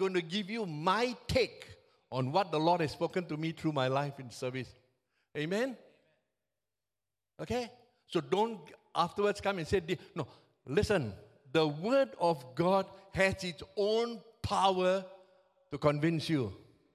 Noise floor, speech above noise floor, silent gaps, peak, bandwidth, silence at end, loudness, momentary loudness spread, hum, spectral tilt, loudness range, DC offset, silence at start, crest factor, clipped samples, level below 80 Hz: under -90 dBFS; over 58 dB; none; -12 dBFS; 14 kHz; 0.4 s; -33 LUFS; 13 LU; none; -5.5 dB/octave; 8 LU; under 0.1%; 0 s; 20 dB; under 0.1%; -58 dBFS